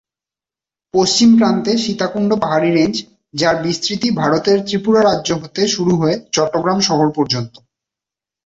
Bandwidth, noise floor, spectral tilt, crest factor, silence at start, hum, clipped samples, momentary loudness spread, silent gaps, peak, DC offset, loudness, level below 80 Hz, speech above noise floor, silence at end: 8 kHz; -89 dBFS; -4.5 dB/octave; 14 dB; 0.95 s; none; under 0.1%; 7 LU; none; -2 dBFS; under 0.1%; -15 LUFS; -52 dBFS; 74 dB; 1 s